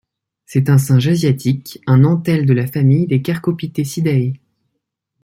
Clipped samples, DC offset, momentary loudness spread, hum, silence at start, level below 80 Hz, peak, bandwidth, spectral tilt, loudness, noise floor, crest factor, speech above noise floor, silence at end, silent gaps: under 0.1%; under 0.1%; 9 LU; none; 0.5 s; -54 dBFS; -2 dBFS; 16 kHz; -7.5 dB/octave; -15 LUFS; -74 dBFS; 14 dB; 60 dB; 0.85 s; none